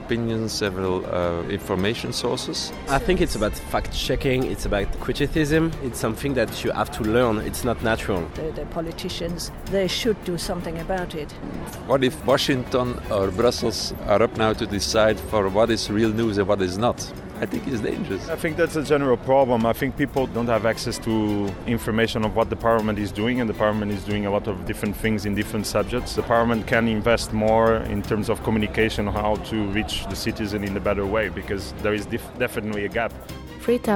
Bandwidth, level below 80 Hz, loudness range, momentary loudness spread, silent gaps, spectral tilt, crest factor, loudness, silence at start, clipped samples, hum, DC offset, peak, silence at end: 17 kHz; -38 dBFS; 4 LU; 8 LU; none; -5 dB/octave; 18 dB; -23 LUFS; 0 s; under 0.1%; none; under 0.1%; -6 dBFS; 0 s